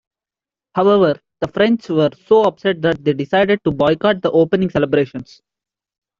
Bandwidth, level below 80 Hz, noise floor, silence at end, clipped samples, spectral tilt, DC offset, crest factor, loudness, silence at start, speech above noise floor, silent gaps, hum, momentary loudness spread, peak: 7.2 kHz; -52 dBFS; -90 dBFS; 0.95 s; under 0.1%; -7.5 dB/octave; under 0.1%; 14 dB; -16 LUFS; 0.75 s; 74 dB; none; none; 7 LU; -2 dBFS